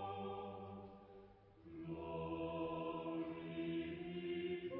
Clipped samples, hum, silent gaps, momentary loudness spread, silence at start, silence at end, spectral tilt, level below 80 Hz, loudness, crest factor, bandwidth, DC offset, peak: under 0.1%; none; none; 16 LU; 0 s; 0 s; -5.5 dB/octave; -68 dBFS; -46 LUFS; 14 dB; 4.6 kHz; under 0.1%; -32 dBFS